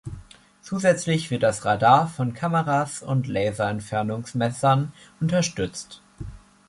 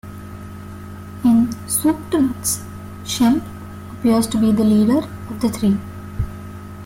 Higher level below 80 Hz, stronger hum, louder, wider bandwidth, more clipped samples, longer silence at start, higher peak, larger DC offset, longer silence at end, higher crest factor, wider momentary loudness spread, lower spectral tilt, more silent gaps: second, -50 dBFS vs -42 dBFS; neither; second, -23 LUFS vs -18 LUFS; second, 11.5 kHz vs 16.5 kHz; neither; about the same, 0.05 s vs 0.05 s; about the same, -2 dBFS vs -4 dBFS; neither; first, 0.3 s vs 0 s; first, 20 dB vs 14 dB; about the same, 20 LU vs 19 LU; about the same, -5.5 dB/octave vs -5.5 dB/octave; neither